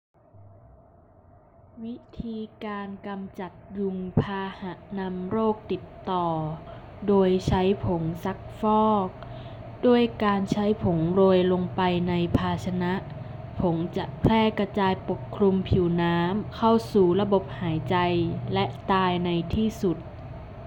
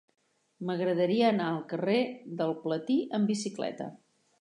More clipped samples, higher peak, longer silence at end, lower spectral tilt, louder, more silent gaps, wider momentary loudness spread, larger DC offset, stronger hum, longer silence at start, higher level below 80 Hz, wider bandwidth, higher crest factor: neither; first, -8 dBFS vs -12 dBFS; second, 0 s vs 0.45 s; first, -8 dB/octave vs -6 dB/octave; first, -25 LUFS vs -30 LUFS; neither; first, 16 LU vs 10 LU; neither; neither; second, 0.35 s vs 0.6 s; first, -46 dBFS vs -84 dBFS; first, 16.5 kHz vs 11 kHz; about the same, 16 dB vs 18 dB